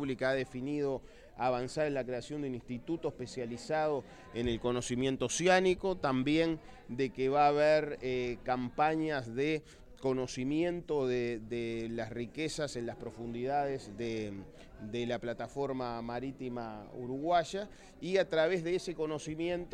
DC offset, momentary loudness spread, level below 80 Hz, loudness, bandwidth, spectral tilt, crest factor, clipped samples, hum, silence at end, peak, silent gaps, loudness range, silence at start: under 0.1%; 12 LU; -58 dBFS; -34 LUFS; 11.5 kHz; -5 dB/octave; 20 dB; under 0.1%; none; 0 s; -14 dBFS; none; 7 LU; 0 s